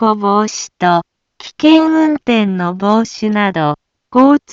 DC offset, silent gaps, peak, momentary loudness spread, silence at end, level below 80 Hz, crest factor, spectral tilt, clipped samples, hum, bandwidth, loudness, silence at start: under 0.1%; none; 0 dBFS; 9 LU; 0.15 s; -56 dBFS; 12 dB; -5.5 dB/octave; under 0.1%; none; 7.6 kHz; -13 LUFS; 0 s